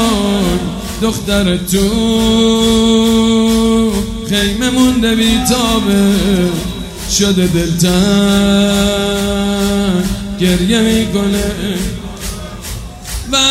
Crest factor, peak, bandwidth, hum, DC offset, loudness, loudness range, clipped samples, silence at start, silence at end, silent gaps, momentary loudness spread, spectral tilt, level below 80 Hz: 12 dB; 0 dBFS; 16 kHz; none; under 0.1%; -12 LUFS; 3 LU; under 0.1%; 0 s; 0 s; none; 11 LU; -4.5 dB/octave; -26 dBFS